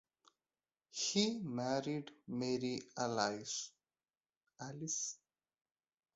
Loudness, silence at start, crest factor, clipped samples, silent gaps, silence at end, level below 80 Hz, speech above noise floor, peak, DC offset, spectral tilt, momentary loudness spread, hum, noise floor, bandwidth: -39 LUFS; 0.95 s; 24 dB; under 0.1%; 4.17-4.21 s, 4.37-4.41 s; 1 s; -82 dBFS; over 50 dB; -18 dBFS; under 0.1%; -4 dB/octave; 14 LU; none; under -90 dBFS; 8 kHz